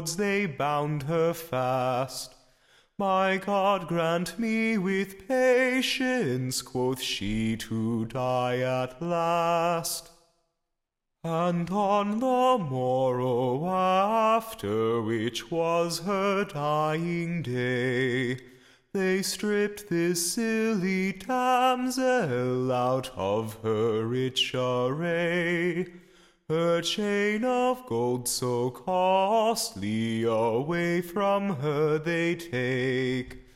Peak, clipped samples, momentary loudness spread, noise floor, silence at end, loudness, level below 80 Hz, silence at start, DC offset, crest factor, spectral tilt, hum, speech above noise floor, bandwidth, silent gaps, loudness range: -12 dBFS; under 0.1%; 6 LU; -82 dBFS; 0.15 s; -27 LUFS; -58 dBFS; 0 s; under 0.1%; 14 dB; -5 dB/octave; none; 56 dB; 16.5 kHz; none; 3 LU